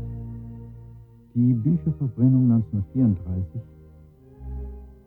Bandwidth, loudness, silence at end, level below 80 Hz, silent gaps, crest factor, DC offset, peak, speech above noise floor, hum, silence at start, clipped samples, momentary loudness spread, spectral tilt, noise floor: 1.6 kHz; -23 LUFS; 0.15 s; -42 dBFS; none; 16 dB; under 0.1%; -8 dBFS; 28 dB; none; 0 s; under 0.1%; 21 LU; -13.5 dB/octave; -49 dBFS